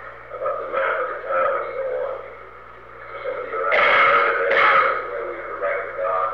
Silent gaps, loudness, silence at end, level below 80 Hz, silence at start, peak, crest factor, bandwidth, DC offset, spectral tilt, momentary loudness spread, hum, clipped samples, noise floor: none; -20 LUFS; 0 s; -56 dBFS; 0 s; -6 dBFS; 16 dB; 6.6 kHz; 0.3%; -4.5 dB/octave; 20 LU; 60 Hz at -55 dBFS; under 0.1%; -41 dBFS